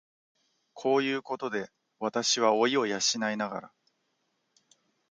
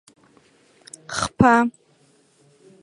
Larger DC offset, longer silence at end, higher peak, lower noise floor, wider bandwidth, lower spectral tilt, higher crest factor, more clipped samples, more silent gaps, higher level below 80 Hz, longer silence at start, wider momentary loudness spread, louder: neither; first, 1.45 s vs 1.1 s; second, -10 dBFS vs 0 dBFS; first, -77 dBFS vs -59 dBFS; about the same, 10 kHz vs 11 kHz; second, -2.5 dB/octave vs -5 dB/octave; about the same, 22 dB vs 24 dB; neither; neither; second, -80 dBFS vs -50 dBFS; second, 0.75 s vs 1.1 s; second, 12 LU vs 26 LU; second, -28 LUFS vs -19 LUFS